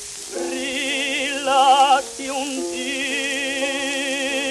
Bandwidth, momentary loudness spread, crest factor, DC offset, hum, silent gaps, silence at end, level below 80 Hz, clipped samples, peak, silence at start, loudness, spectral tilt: 13.5 kHz; 10 LU; 16 dB; under 0.1%; none; none; 0 s; -60 dBFS; under 0.1%; -4 dBFS; 0 s; -20 LUFS; 0 dB/octave